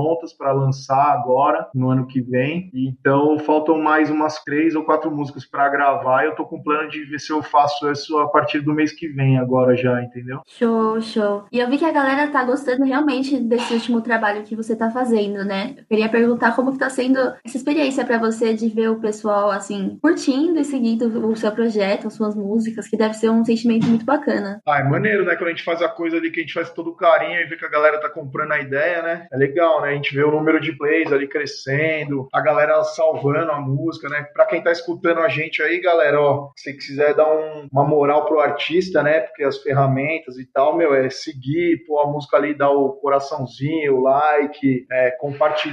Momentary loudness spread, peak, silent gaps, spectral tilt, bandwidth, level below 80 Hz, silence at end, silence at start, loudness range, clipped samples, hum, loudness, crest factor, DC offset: 7 LU; -2 dBFS; none; -6.5 dB/octave; 11.5 kHz; -66 dBFS; 0 s; 0 s; 2 LU; under 0.1%; none; -19 LUFS; 18 dB; under 0.1%